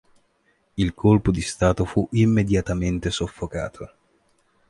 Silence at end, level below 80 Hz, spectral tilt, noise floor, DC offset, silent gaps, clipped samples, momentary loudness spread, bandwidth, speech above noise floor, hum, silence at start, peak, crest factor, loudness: 0.85 s; -38 dBFS; -6.5 dB/octave; -66 dBFS; under 0.1%; none; under 0.1%; 14 LU; 11.5 kHz; 44 dB; none; 0.75 s; -4 dBFS; 18 dB; -22 LUFS